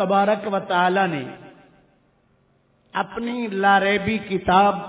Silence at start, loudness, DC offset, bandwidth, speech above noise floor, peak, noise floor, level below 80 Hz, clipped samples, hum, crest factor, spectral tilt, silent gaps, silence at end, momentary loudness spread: 0 s; -21 LUFS; under 0.1%; 4 kHz; 42 dB; -4 dBFS; -62 dBFS; -52 dBFS; under 0.1%; none; 18 dB; -9.5 dB/octave; none; 0 s; 11 LU